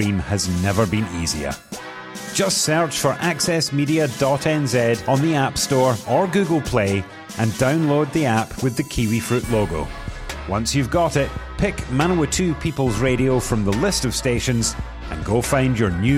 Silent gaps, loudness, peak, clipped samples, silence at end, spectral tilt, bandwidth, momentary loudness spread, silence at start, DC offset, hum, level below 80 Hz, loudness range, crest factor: none; -20 LUFS; -4 dBFS; under 0.1%; 0 s; -5 dB/octave; 16.5 kHz; 8 LU; 0 s; under 0.1%; none; -36 dBFS; 3 LU; 16 dB